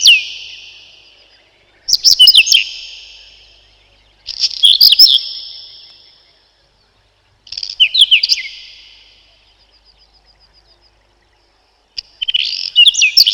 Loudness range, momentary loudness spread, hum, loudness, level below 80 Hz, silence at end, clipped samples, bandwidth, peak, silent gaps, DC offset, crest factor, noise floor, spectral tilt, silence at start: 6 LU; 25 LU; none; -7 LUFS; -56 dBFS; 0 s; under 0.1%; 19.5 kHz; 0 dBFS; none; under 0.1%; 16 dB; -56 dBFS; 5 dB/octave; 0 s